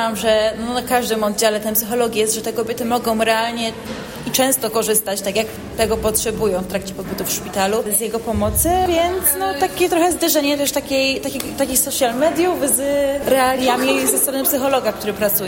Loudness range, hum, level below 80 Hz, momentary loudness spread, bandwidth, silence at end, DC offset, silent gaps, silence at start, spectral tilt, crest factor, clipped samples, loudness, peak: 3 LU; none; -40 dBFS; 6 LU; 16.5 kHz; 0 s; under 0.1%; none; 0 s; -3 dB/octave; 16 dB; under 0.1%; -18 LUFS; -2 dBFS